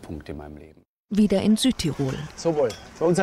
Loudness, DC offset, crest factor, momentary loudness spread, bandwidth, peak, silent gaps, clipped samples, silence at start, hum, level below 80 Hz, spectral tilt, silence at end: -23 LUFS; under 0.1%; 14 dB; 17 LU; 14.5 kHz; -10 dBFS; 0.88-1.05 s; under 0.1%; 0 s; none; -46 dBFS; -5.5 dB/octave; 0 s